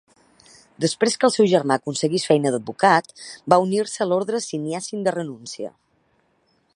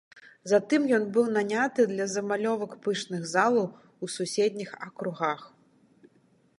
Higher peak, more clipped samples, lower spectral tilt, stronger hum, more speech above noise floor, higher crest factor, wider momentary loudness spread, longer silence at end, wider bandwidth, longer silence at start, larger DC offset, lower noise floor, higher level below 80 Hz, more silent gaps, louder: first, 0 dBFS vs -8 dBFS; neither; about the same, -4.5 dB/octave vs -4.5 dB/octave; neither; first, 44 dB vs 37 dB; about the same, 22 dB vs 20 dB; about the same, 15 LU vs 13 LU; about the same, 1.05 s vs 1.1 s; about the same, 11.5 kHz vs 11.5 kHz; first, 0.8 s vs 0.45 s; neither; about the same, -65 dBFS vs -64 dBFS; first, -70 dBFS vs -80 dBFS; neither; first, -21 LUFS vs -27 LUFS